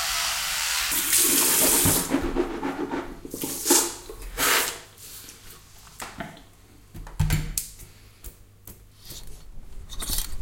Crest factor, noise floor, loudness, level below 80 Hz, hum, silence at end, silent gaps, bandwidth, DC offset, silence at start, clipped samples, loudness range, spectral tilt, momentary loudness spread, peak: 24 dB; -51 dBFS; -22 LUFS; -40 dBFS; none; 0 s; none; 17 kHz; under 0.1%; 0 s; under 0.1%; 13 LU; -2 dB/octave; 24 LU; -4 dBFS